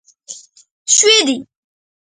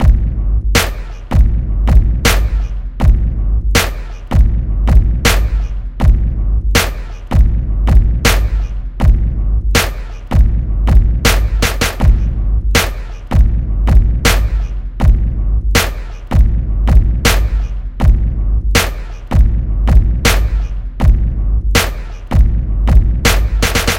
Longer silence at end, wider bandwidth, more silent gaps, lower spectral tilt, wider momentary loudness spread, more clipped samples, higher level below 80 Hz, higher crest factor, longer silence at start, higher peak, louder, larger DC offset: first, 0.75 s vs 0 s; second, 10.5 kHz vs 16.5 kHz; first, 0.71-0.85 s vs none; second, 1 dB/octave vs -4.5 dB/octave; first, 25 LU vs 8 LU; second, under 0.1% vs 0.3%; second, -68 dBFS vs -12 dBFS; first, 18 dB vs 12 dB; first, 0.3 s vs 0 s; about the same, 0 dBFS vs 0 dBFS; first, -11 LUFS vs -15 LUFS; neither